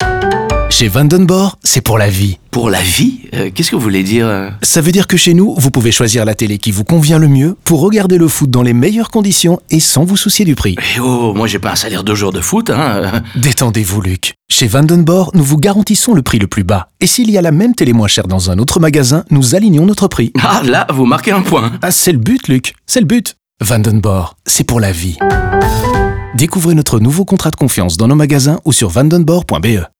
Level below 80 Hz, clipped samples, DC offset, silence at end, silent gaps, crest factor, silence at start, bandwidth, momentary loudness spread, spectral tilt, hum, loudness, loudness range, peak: -30 dBFS; under 0.1%; 0.5%; 0.15 s; none; 10 dB; 0 s; over 20 kHz; 6 LU; -4.5 dB/octave; none; -10 LUFS; 3 LU; 0 dBFS